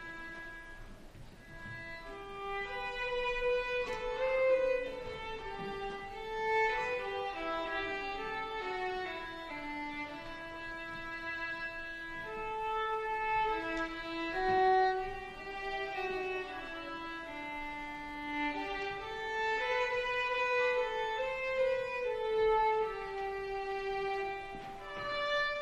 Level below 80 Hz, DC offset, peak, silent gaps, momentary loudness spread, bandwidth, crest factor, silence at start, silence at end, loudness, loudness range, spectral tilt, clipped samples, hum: -54 dBFS; under 0.1%; -18 dBFS; none; 13 LU; 12.5 kHz; 18 dB; 0 s; 0 s; -36 LUFS; 7 LU; -4 dB/octave; under 0.1%; none